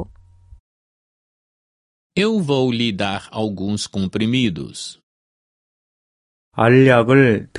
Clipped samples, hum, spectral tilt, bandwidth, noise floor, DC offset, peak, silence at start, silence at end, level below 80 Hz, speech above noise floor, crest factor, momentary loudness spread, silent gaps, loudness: under 0.1%; none; -6 dB/octave; 11.5 kHz; -46 dBFS; under 0.1%; 0 dBFS; 0 s; 0 s; -50 dBFS; 29 dB; 20 dB; 18 LU; 0.60-2.10 s, 5.03-6.51 s; -17 LUFS